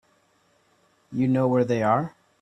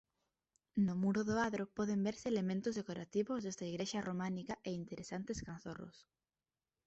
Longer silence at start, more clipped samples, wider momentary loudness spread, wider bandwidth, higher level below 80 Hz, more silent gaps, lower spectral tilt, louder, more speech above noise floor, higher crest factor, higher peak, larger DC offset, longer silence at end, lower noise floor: first, 1.1 s vs 0.75 s; neither; about the same, 11 LU vs 10 LU; about the same, 8.4 kHz vs 8.2 kHz; about the same, -64 dBFS vs -68 dBFS; neither; first, -8.5 dB/octave vs -6 dB/octave; first, -23 LUFS vs -40 LUFS; second, 42 dB vs over 51 dB; about the same, 18 dB vs 16 dB; first, -8 dBFS vs -24 dBFS; neither; second, 0.35 s vs 0.85 s; second, -65 dBFS vs under -90 dBFS